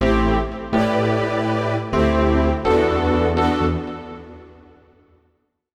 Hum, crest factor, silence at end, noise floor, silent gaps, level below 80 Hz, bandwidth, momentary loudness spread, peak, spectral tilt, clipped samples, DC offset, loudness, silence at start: none; 14 dB; 1.25 s; -66 dBFS; none; -30 dBFS; 10.5 kHz; 9 LU; -6 dBFS; -7.5 dB/octave; under 0.1%; under 0.1%; -19 LUFS; 0 s